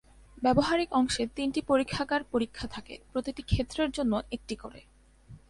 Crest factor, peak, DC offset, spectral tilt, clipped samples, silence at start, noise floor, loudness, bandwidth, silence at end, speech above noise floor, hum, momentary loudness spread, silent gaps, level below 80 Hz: 20 dB; -10 dBFS; under 0.1%; -5 dB/octave; under 0.1%; 0.35 s; -53 dBFS; -30 LUFS; 11.5 kHz; 0.15 s; 24 dB; none; 14 LU; none; -46 dBFS